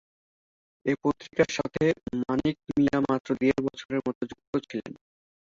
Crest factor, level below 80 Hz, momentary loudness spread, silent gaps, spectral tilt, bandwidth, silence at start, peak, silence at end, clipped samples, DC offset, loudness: 20 dB; -58 dBFS; 9 LU; 3.20-3.24 s, 3.85-3.89 s, 4.15-4.21 s, 4.47-4.53 s; -6 dB/octave; 7.6 kHz; 0.85 s; -8 dBFS; 0.65 s; under 0.1%; under 0.1%; -28 LUFS